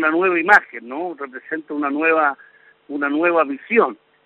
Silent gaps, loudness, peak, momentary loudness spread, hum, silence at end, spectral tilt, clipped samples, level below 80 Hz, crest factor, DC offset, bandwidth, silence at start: none; -18 LUFS; 0 dBFS; 16 LU; none; 0.3 s; -2.5 dB/octave; under 0.1%; -68 dBFS; 20 dB; under 0.1%; 6.4 kHz; 0 s